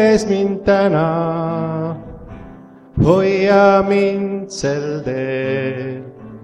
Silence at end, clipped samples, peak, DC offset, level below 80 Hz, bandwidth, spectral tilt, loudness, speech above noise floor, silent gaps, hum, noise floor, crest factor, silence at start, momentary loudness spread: 0 s; under 0.1%; 0 dBFS; under 0.1%; -40 dBFS; 10.5 kHz; -6.5 dB/octave; -16 LUFS; 24 dB; none; none; -39 dBFS; 16 dB; 0 s; 19 LU